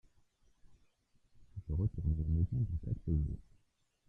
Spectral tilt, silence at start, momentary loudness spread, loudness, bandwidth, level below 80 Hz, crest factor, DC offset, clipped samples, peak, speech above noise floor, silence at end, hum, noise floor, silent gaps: -12 dB/octave; 0.7 s; 14 LU; -37 LUFS; 1.2 kHz; -46 dBFS; 16 dB; under 0.1%; under 0.1%; -22 dBFS; 40 dB; 0.65 s; none; -76 dBFS; none